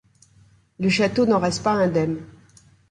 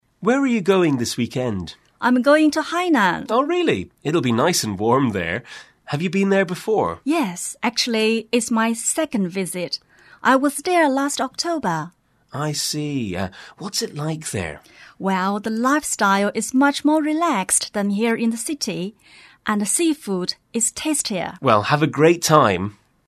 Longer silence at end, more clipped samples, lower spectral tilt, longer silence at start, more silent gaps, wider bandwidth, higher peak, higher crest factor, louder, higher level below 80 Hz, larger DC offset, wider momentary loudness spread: first, 0.6 s vs 0.35 s; neither; first, -5.5 dB/octave vs -4 dB/octave; first, 0.8 s vs 0.2 s; neither; second, 10.5 kHz vs 13.5 kHz; second, -8 dBFS vs 0 dBFS; about the same, 16 dB vs 20 dB; about the same, -21 LUFS vs -20 LUFS; about the same, -54 dBFS vs -58 dBFS; neither; second, 7 LU vs 11 LU